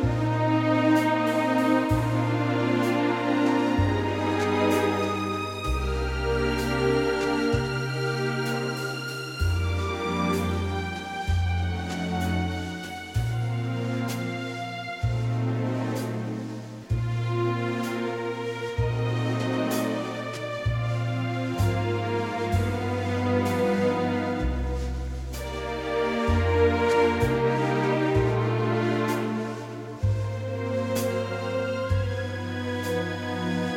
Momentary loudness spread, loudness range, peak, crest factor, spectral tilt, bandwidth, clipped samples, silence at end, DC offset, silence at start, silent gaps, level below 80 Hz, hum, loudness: 8 LU; 5 LU; -10 dBFS; 16 dB; -6.5 dB/octave; 17 kHz; under 0.1%; 0 s; under 0.1%; 0 s; none; -38 dBFS; none; -26 LUFS